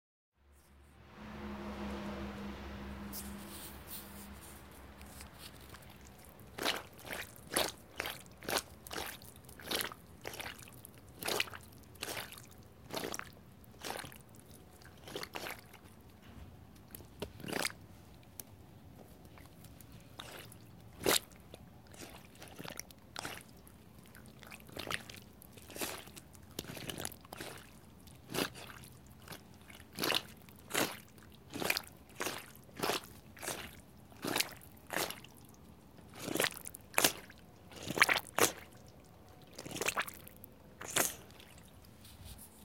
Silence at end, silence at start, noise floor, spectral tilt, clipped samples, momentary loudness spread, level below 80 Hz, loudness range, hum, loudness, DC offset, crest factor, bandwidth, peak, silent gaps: 0 s; 0.3 s; -64 dBFS; -2 dB/octave; under 0.1%; 22 LU; -62 dBFS; 12 LU; none; -39 LUFS; under 0.1%; 38 dB; 17 kHz; -4 dBFS; none